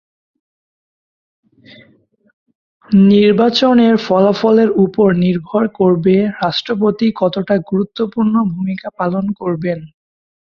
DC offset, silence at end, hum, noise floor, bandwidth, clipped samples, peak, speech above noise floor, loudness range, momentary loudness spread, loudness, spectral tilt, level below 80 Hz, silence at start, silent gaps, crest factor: under 0.1%; 0.6 s; none; under -90 dBFS; 7 kHz; under 0.1%; -2 dBFS; over 77 dB; 6 LU; 9 LU; -14 LUFS; -7.5 dB/octave; -54 dBFS; 2.9 s; none; 14 dB